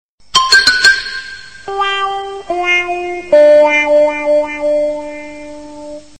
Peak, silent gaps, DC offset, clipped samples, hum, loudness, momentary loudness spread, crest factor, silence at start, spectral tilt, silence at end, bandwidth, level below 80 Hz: 0 dBFS; none; 1%; under 0.1%; none; -11 LUFS; 22 LU; 14 dB; 0.35 s; -1 dB/octave; 0.2 s; 12 kHz; -46 dBFS